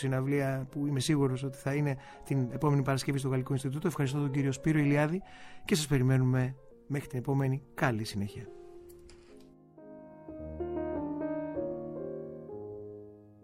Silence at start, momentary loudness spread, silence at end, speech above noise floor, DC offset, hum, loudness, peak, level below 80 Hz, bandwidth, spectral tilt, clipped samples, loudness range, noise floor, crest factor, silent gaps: 0 s; 20 LU; 0.15 s; 25 dB; under 0.1%; none; -32 LUFS; -14 dBFS; -56 dBFS; 15 kHz; -6.5 dB/octave; under 0.1%; 9 LU; -55 dBFS; 18 dB; none